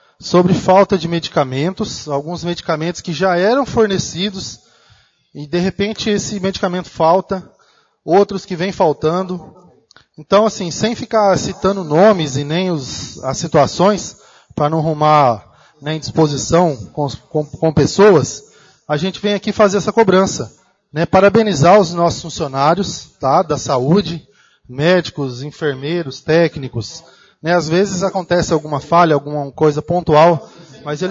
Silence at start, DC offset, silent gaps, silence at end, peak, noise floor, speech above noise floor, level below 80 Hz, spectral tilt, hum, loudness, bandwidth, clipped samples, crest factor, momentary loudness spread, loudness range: 0.2 s; under 0.1%; none; 0 s; 0 dBFS; -55 dBFS; 40 dB; -46 dBFS; -5.5 dB/octave; none; -15 LUFS; 7.8 kHz; under 0.1%; 16 dB; 13 LU; 5 LU